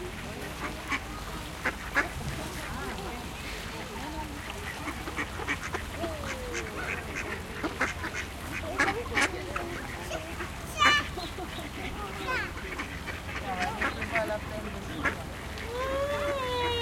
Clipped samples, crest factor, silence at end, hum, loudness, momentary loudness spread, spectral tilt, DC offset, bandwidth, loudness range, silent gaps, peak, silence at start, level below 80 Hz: under 0.1%; 26 dB; 0 s; none; -32 LUFS; 9 LU; -3.5 dB/octave; under 0.1%; 16.5 kHz; 6 LU; none; -8 dBFS; 0 s; -44 dBFS